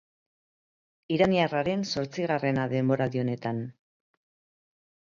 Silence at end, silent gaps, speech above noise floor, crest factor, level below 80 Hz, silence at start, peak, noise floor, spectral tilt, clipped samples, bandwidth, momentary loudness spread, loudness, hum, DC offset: 1.4 s; none; over 63 dB; 20 dB; -62 dBFS; 1.1 s; -10 dBFS; under -90 dBFS; -6.5 dB/octave; under 0.1%; 7.6 kHz; 9 LU; -27 LUFS; none; under 0.1%